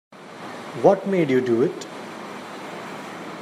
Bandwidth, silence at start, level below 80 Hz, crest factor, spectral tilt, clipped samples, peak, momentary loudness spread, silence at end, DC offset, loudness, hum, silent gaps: 14 kHz; 0.1 s; -72 dBFS; 22 dB; -6.5 dB/octave; under 0.1%; -2 dBFS; 17 LU; 0 s; under 0.1%; -21 LUFS; none; none